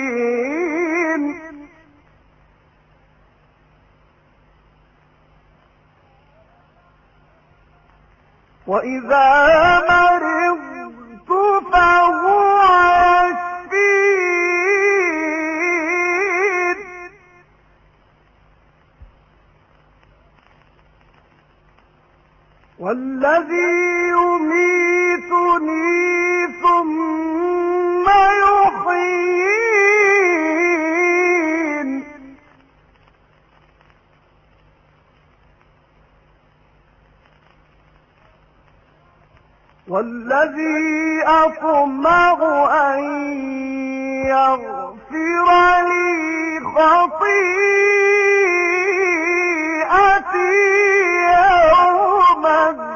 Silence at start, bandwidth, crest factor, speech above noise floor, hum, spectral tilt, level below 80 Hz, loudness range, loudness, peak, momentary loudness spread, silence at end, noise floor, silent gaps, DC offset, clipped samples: 0 s; 7.4 kHz; 16 dB; 42 dB; none; -4 dB/octave; -50 dBFS; 11 LU; -15 LUFS; -2 dBFS; 11 LU; 0 s; -54 dBFS; none; under 0.1%; under 0.1%